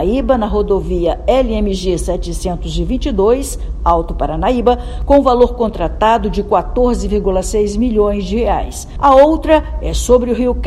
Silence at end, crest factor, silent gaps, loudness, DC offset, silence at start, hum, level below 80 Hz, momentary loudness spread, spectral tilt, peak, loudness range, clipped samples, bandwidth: 0 s; 14 dB; none; -14 LUFS; under 0.1%; 0 s; none; -22 dBFS; 9 LU; -6 dB/octave; 0 dBFS; 3 LU; 0.3%; 13.5 kHz